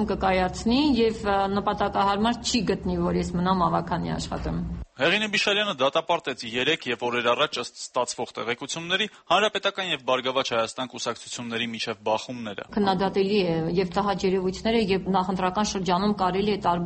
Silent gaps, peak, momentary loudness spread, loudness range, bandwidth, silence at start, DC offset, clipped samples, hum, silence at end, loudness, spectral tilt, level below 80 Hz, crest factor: none; -8 dBFS; 8 LU; 3 LU; 8.8 kHz; 0 s; under 0.1%; under 0.1%; none; 0 s; -25 LUFS; -4.5 dB/octave; -46 dBFS; 18 dB